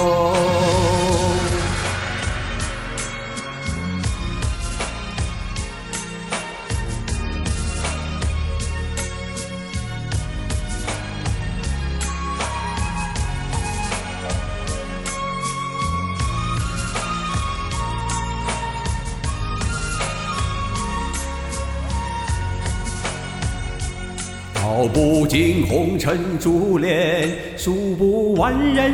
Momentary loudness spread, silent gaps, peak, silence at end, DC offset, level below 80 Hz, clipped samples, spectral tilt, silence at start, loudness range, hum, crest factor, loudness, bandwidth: 10 LU; none; -4 dBFS; 0 s; 0.1%; -30 dBFS; under 0.1%; -5 dB/octave; 0 s; 7 LU; none; 18 dB; -23 LUFS; 16 kHz